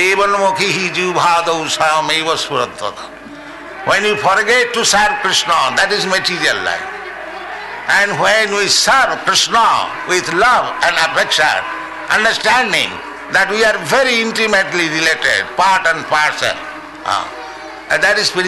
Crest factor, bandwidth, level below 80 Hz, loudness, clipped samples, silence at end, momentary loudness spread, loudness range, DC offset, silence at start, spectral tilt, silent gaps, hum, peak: 12 dB; 12.5 kHz; -48 dBFS; -13 LUFS; under 0.1%; 0 s; 14 LU; 3 LU; under 0.1%; 0 s; -1.5 dB/octave; none; none; -2 dBFS